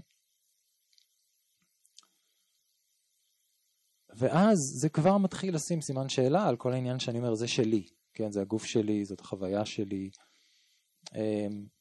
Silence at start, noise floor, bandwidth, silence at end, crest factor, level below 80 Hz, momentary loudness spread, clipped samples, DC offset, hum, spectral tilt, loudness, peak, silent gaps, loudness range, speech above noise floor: 4.15 s; -76 dBFS; 12.5 kHz; 0.15 s; 18 dB; -68 dBFS; 12 LU; under 0.1%; under 0.1%; none; -5.5 dB/octave; -30 LUFS; -14 dBFS; none; 6 LU; 46 dB